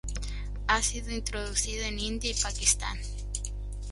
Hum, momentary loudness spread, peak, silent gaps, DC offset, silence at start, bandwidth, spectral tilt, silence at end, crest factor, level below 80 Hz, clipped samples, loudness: 50 Hz at -35 dBFS; 12 LU; -10 dBFS; none; under 0.1%; 0.05 s; 12 kHz; -2 dB/octave; 0 s; 20 dB; -36 dBFS; under 0.1%; -30 LUFS